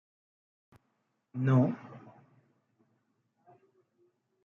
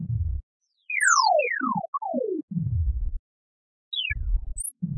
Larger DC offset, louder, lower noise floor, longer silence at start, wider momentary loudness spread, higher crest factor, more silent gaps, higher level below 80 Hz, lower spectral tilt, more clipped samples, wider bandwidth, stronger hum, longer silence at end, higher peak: neither; second, -29 LUFS vs -26 LUFS; second, -79 dBFS vs under -90 dBFS; first, 1.35 s vs 0 s; first, 25 LU vs 13 LU; about the same, 20 dB vs 20 dB; second, none vs 0.43-0.60 s, 1.88-1.93 s, 2.43-2.48 s, 3.19-3.91 s; second, -80 dBFS vs -34 dBFS; first, -9.5 dB/octave vs -3.5 dB/octave; neither; second, 3.8 kHz vs 11 kHz; neither; first, 2.45 s vs 0 s; second, -16 dBFS vs -8 dBFS